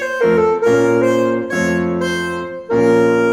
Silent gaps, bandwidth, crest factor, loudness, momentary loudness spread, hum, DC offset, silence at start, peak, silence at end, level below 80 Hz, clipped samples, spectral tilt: none; 15 kHz; 12 dB; -15 LUFS; 7 LU; none; under 0.1%; 0 s; -2 dBFS; 0 s; -48 dBFS; under 0.1%; -6 dB/octave